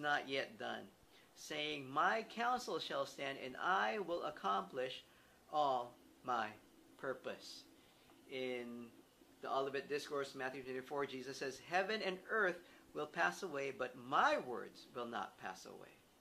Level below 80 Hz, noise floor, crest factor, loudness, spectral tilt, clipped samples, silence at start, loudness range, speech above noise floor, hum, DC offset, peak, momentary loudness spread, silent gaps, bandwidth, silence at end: -82 dBFS; -66 dBFS; 22 dB; -41 LUFS; -3.5 dB/octave; under 0.1%; 0 s; 6 LU; 25 dB; none; under 0.1%; -20 dBFS; 15 LU; none; 15 kHz; 0.25 s